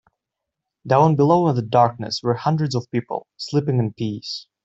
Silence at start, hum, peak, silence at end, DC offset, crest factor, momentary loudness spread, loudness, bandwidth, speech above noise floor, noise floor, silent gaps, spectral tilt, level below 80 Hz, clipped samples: 0.85 s; none; -2 dBFS; 0.25 s; under 0.1%; 18 dB; 12 LU; -20 LUFS; 8 kHz; 63 dB; -83 dBFS; none; -7 dB/octave; -60 dBFS; under 0.1%